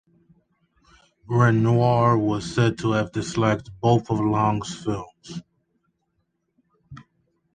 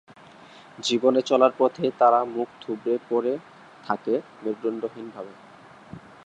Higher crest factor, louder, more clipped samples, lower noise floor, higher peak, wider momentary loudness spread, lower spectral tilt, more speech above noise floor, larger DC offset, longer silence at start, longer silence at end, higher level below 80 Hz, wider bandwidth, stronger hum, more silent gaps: about the same, 20 dB vs 20 dB; about the same, -22 LUFS vs -24 LUFS; neither; first, -73 dBFS vs -48 dBFS; about the same, -4 dBFS vs -6 dBFS; second, 13 LU vs 21 LU; first, -7 dB/octave vs -4.5 dB/octave; first, 52 dB vs 24 dB; neither; first, 1.3 s vs 0.8 s; first, 0.55 s vs 0.25 s; first, -52 dBFS vs -72 dBFS; about the same, 9.4 kHz vs 9.8 kHz; neither; neither